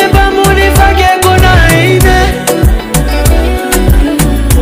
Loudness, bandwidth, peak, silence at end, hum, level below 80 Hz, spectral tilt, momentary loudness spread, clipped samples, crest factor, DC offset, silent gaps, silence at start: -8 LUFS; 16.5 kHz; 0 dBFS; 0 s; none; -10 dBFS; -5 dB/octave; 5 LU; 0.9%; 6 dB; under 0.1%; none; 0 s